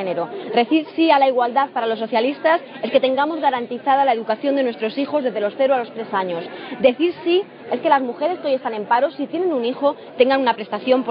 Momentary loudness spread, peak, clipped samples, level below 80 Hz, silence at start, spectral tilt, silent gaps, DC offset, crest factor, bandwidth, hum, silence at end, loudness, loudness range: 7 LU; -2 dBFS; under 0.1%; -72 dBFS; 0 s; -2 dB/octave; none; under 0.1%; 18 dB; 5.2 kHz; none; 0 s; -19 LUFS; 2 LU